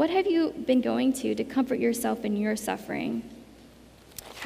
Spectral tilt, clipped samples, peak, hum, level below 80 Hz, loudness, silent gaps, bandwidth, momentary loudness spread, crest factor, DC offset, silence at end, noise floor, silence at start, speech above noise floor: -5 dB/octave; under 0.1%; -12 dBFS; none; -60 dBFS; -27 LUFS; none; 15.5 kHz; 15 LU; 16 dB; under 0.1%; 0 s; -52 dBFS; 0 s; 25 dB